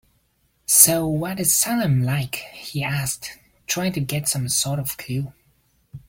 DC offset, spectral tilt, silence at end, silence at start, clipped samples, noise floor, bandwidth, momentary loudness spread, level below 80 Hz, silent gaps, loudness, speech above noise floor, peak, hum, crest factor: under 0.1%; -3.5 dB/octave; 0.1 s; 0.7 s; under 0.1%; -65 dBFS; 17 kHz; 18 LU; -54 dBFS; none; -20 LUFS; 43 dB; 0 dBFS; none; 22 dB